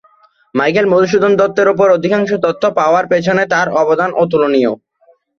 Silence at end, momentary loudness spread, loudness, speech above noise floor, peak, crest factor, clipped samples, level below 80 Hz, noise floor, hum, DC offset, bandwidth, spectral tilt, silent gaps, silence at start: 0.65 s; 4 LU; -13 LUFS; 41 dB; 0 dBFS; 12 dB; under 0.1%; -56 dBFS; -53 dBFS; none; under 0.1%; 7.2 kHz; -6 dB/octave; none; 0.55 s